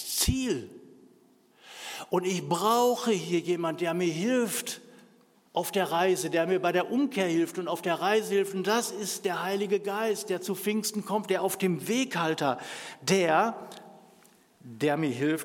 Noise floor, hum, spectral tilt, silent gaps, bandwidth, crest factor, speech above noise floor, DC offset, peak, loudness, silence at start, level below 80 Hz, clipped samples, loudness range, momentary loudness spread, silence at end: -61 dBFS; none; -4 dB/octave; none; 17.5 kHz; 18 dB; 33 dB; under 0.1%; -10 dBFS; -28 LUFS; 0 s; -52 dBFS; under 0.1%; 2 LU; 9 LU; 0 s